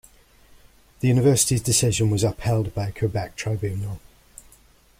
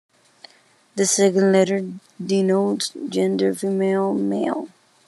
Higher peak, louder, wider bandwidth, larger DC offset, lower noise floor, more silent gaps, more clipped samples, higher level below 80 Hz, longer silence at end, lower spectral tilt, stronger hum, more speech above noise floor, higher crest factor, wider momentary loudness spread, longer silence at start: about the same, -6 dBFS vs -4 dBFS; about the same, -22 LUFS vs -20 LUFS; first, 16 kHz vs 12.5 kHz; neither; about the same, -55 dBFS vs -56 dBFS; neither; neither; first, -46 dBFS vs -78 dBFS; first, 1 s vs 0.4 s; about the same, -5 dB/octave vs -4.5 dB/octave; neither; about the same, 33 dB vs 36 dB; about the same, 18 dB vs 16 dB; about the same, 11 LU vs 13 LU; about the same, 1 s vs 0.95 s